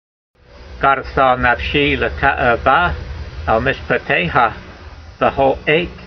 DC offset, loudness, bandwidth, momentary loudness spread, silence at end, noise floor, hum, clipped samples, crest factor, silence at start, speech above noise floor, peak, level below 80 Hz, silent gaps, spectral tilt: under 0.1%; -15 LUFS; 6.4 kHz; 7 LU; 0 s; -36 dBFS; none; under 0.1%; 16 dB; 0.55 s; 21 dB; 0 dBFS; -32 dBFS; none; -7 dB/octave